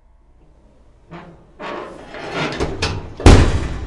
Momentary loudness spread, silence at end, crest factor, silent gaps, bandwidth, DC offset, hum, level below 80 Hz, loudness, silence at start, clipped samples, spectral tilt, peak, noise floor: 25 LU; 0 s; 18 dB; none; 11.5 kHz; under 0.1%; none; -22 dBFS; -17 LUFS; 1.1 s; under 0.1%; -6 dB/octave; 0 dBFS; -49 dBFS